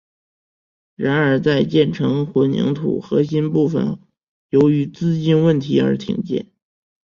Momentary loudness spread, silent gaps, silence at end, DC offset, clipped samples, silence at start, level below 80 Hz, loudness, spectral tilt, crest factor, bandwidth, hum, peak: 7 LU; 4.23-4.49 s; 0.7 s; under 0.1%; under 0.1%; 1 s; -54 dBFS; -18 LUFS; -8 dB/octave; 16 dB; 7.2 kHz; none; -2 dBFS